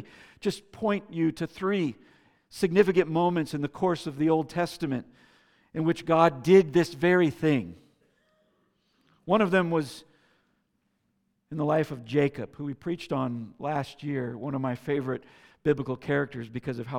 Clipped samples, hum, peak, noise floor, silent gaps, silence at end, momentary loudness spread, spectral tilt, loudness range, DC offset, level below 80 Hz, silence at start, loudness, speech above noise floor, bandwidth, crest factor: under 0.1%; none; -6 dBFS; -74 dBFS; none; 0 s; 13 LU; -7 dB/octave; 6 LU; under 0.1%; -64 dBFS; 0 s; -27 LUFS; 48 dB; 14.5 kHz; 22 dB